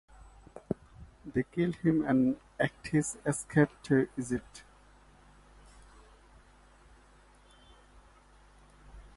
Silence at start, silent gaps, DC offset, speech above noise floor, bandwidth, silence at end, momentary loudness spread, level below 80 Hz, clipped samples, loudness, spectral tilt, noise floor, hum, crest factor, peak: 0.55 s; none; under 0.1%; 30 dB; 11.5 kHz; 0.15 s; 21 LU; -58 dBFS; under 0.1%; -31 LUFS; -6.5 dB/octave; -60 dBFS; 50 Hz at -55 dBFS; 22 dB; -12 dBFS